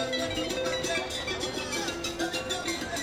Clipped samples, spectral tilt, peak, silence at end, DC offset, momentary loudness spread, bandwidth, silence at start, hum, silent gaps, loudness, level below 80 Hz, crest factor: under 0.1%; -2.5 dB/octave; -16 dBFS; 0 s; under 0.1%; 2 LU; 16.5 kHz; 0 s; none; none; -30 LUFS; -50 dBFS; 16 dB